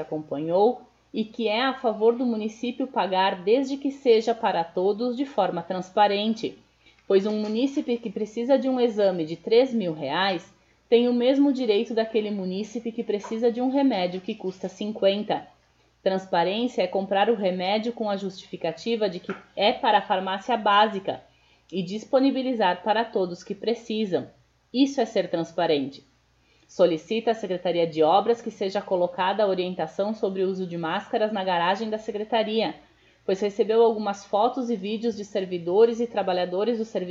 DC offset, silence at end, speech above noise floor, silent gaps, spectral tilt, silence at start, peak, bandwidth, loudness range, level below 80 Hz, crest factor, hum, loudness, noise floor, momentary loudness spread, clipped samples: under 0.1%; 0 s; 38 dB; none; -5.5 dB/octave; 0 s; -6 dBFS; 7.6 kHz; 3 LU; -68 dBFS; 18 dB; none; -25 LUFS; -63 dBFS; 10 LU; under 0.1%